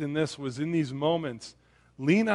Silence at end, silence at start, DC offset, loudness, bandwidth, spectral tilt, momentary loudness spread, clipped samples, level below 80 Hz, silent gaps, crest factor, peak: 0 s; 0 s; under 0.1%; -29 LUFS; 11.5 kHz; -6.5 dB/octave; 13 LU; under 0.1%; -66 dBFS; none; 18 dB; -10 dBFS